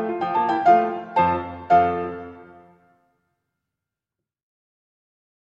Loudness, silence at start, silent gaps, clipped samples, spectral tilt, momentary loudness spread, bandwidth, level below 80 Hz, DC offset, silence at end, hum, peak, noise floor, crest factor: -20 LUFS; 0 s; none; under 0.1%; -7.5 dB/octave; 14 LU; 7 kHz; -58 dBFS; under 0.1%; 3.15 s; none; -6 dBFS; -87 dBFS; 18 dB